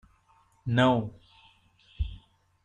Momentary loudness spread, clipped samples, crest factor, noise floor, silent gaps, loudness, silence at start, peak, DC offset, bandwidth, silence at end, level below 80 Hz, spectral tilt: 17 LU; under 0.1%; 20 dB; -64 dBFS; none; -28 LUFS; 0.65 s; -10 dBFS; under 0.1%; 9.2 kHz; 0.45 s; -44 dBFS; -7.5 dB/octave